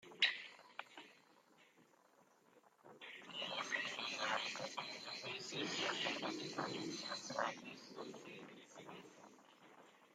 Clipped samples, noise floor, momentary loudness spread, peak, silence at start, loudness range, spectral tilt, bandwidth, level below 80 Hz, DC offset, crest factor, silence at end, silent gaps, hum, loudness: under 0.1%; -71 dBFS; 22 LU; -20 dBFS; 0 s; 7 LU; -2 dB/octave; 16 kHz; under -90 dBFS; under 0.1%; 28 dB; 0.05 s; none; none; -43 LUFS